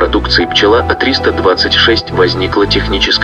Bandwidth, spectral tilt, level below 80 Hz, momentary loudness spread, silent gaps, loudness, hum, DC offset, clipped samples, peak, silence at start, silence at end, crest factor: 9.6 kHz; -4.5 dB/octave; -24 dBFS; 3 LU; none; -10 LUFS; none; under 0.1%; under 0.1%; 0 dBFS; 0 s; 0 s; 10 dB